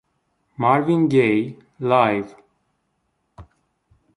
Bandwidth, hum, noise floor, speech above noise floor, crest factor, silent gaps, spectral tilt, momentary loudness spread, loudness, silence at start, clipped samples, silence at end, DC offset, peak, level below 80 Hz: 11 kHz; none; -71 dBFS; 53 dB; 20 dB; none; -8 dB/octave; 12 LU; -19 LUFS; 0.6 s; under 0.1%; 0.75 s; under 0.1%; -2 dBFS; -60 dBFS